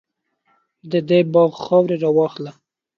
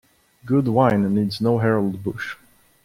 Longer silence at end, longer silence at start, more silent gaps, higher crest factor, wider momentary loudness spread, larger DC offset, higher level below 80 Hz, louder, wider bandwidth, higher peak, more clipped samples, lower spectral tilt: about the same, 0.45 s vs 0.5 s; first, 0.85 s vs 0.45 s; neither; about the same, 16 dB vs 18 dB; second, 10 LU vs 13 LU; neither; second, -66 dBFS vs -56 dBFS; first, -17 LUFS vs -21 LUFS; second, 6.8 kHz vs 15 kHz; about the same, -2 dBFS vs -4 dBFS; neither; about the same, -8.5 dB/octave vs -8 dB/octave